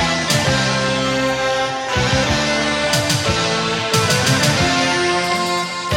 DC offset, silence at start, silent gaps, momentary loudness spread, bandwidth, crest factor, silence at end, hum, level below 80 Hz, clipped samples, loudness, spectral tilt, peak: under 0.1%; 0 s; none; 4 LU; 18.5 kHz; 14 dB; 0 s; none; -40 dBFS; under 0.1%; -16 LUFS; -3.5 dB/octave; -4 dBFS